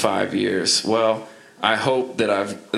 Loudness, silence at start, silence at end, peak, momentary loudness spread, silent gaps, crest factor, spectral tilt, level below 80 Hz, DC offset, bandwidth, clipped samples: -21 LUFS; 0 s; 0 s; -2 dBFS; 5 LU; none; 20 dB; -3 dB/octave; -68 dBFS; under 0.1%; 14 kHz; under 0.1%